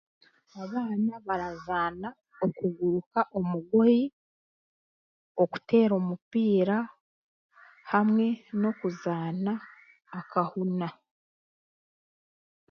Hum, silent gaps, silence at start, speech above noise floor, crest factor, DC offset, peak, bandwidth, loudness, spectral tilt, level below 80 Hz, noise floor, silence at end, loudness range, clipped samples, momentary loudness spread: none; 3.06-3.11 s, 4.13-5.35 s, 6.22-6.31 s, 7.01-7.49 s; 0.55 s; over 63 dB; 18 dB; under 0.1%; -10 dBFS; 6.4 kHz; -28 LUFS; -9 dB/octave; -68 dBFS; under -90 dBFS; 1.8 s; 6 LU; under 0.1%; 12 LU